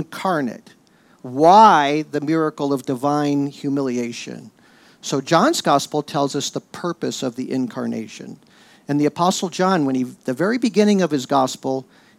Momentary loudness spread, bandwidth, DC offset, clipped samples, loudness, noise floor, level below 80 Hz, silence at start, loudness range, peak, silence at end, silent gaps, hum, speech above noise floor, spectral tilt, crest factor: 13 LU; 15.5 kHz; under 0.1%; under 0.1%; -19 LUFS; -48 dBFS; -72 dBFS; 0 s; 7 LU; -2 dBFS; 0.35 s; none; none; 29 dB; -5 dB/octave; 18 dB